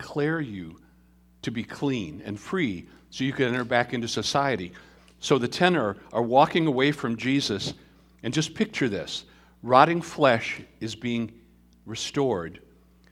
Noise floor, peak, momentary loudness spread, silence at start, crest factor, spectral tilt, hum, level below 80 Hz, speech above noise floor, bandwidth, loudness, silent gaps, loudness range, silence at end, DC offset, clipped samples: -58 dBFS; -2 dBFS; 15 LU; 0 s; 24 dB; -5 dB/octave; none; -58 dBFS; 32 dB; 14.5 kHz; -25 LUFS; none; 5 LU; 0.55 s; under 0.1%; under 0.1%